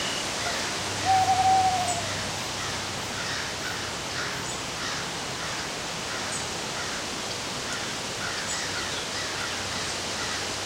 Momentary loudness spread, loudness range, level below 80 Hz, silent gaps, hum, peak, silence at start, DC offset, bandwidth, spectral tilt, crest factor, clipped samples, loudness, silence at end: 8 LU; 4 LU; -52 dBFS; none; none; -12 dBFS; 0 s; under 0.1%; 16 kHz; -2 dB/octave; 18 dB; under 0.1%; -28 LUFS; 0 s